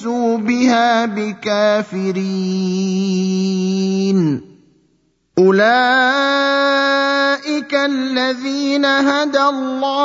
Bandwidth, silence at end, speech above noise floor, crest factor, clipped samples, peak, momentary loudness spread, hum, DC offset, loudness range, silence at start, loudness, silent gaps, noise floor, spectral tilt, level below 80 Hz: 7.8 kHz; 0 s; 46 dB; 16 dB; under 0.1%; 0 dBFS; 7 LU; none; under 0.1%; 4 LU; 0 s; -16 LUFS; none; -61 dBFS; -5 dB/octave; -64 dBFS